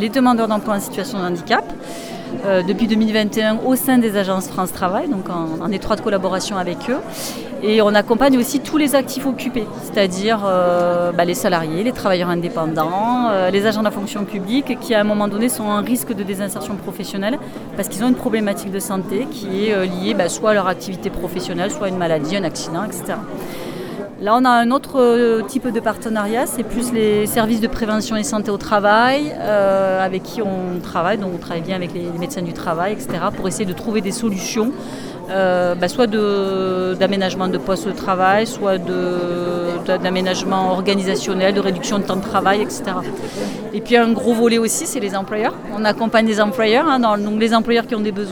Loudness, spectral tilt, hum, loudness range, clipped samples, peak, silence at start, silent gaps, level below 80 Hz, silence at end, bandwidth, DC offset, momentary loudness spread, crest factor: -18 LUFS; -4.5 dB/octave; none; 5 LU; under 0.1%; 0 dBFS; 0 s; none; -46 dBFS; 0 s; over 20 kHz; under 0.1%; 9 LU; 18 dB